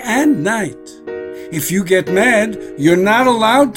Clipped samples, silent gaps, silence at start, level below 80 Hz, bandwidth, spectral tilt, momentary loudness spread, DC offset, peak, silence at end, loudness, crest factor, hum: under 0.1%; none; 0 s; -50 dBFS; 16.5 kHz; -4.5 dB/octave; 16 LU; under 0.1%; 0 dBFS; 0 s; -14 LUFS; 14 dB; none